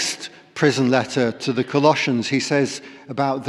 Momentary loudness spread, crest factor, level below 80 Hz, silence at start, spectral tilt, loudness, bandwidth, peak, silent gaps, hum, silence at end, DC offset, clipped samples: 14 LU; 16 dB; -68 dBFS; 0 s; -4.5 dB/octave; -20 LUFS; 13 kHz; -4 dBFS; none; none; 0 s; under 0.1%; under 0.1%